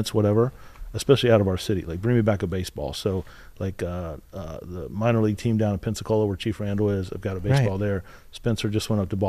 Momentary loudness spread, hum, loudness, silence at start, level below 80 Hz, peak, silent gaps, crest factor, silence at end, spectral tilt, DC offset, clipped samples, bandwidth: 14 LU; none; -25 LUFS; 0 s; -44 dBFS; -4 dBFS; none; 20 dB; 0 s; -6.5 dB/octave; under 0.1%; under 0.1%; 14.5 kHz